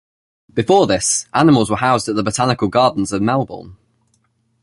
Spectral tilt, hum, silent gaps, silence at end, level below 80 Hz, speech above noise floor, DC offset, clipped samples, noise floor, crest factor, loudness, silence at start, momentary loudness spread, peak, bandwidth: -4.5 dB/octave; none; none; 0.9 s; -46 dBFS; 47 dB; under 0.1%; under 0.1%; -63 dBFS; 16 dB; -16 LUFS; 0.55 s; 9 LU; 0 dBFS; 11.5 kHz